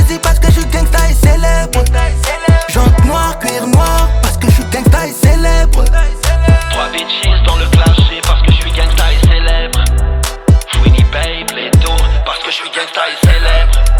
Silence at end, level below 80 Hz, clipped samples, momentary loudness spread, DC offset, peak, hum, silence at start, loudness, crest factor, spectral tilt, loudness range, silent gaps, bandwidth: 0 s; -10 dBFS; under 0.1%; 5 LU; under 0.1%; 0 dBFS; none; 0 s; -11 LUFS; 8 dB; -5 dB/octave; 1 LU; none; 18.5 kHz